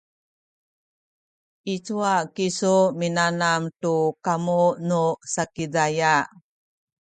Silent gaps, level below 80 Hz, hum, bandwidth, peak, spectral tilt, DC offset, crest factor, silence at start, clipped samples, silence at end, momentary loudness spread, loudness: none; -66 dBFS; none; 9.4 kHz; -6 dBFS; -4.5 dB/octave; under 0.1%; 18 dB; 1.65 s; under 0.1%; 0.75 s; 8 LU; -23 LUFS